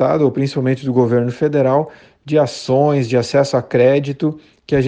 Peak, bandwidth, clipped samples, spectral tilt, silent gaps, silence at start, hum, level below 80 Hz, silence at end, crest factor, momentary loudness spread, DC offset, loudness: 0 dBFS; 9.4 kHz; under 0.1%; -7 dB/octave; none; 0 s; none; -50 dBFS; 0 s; 14 dB; 6 LU; under 0.1%; -16 LUFS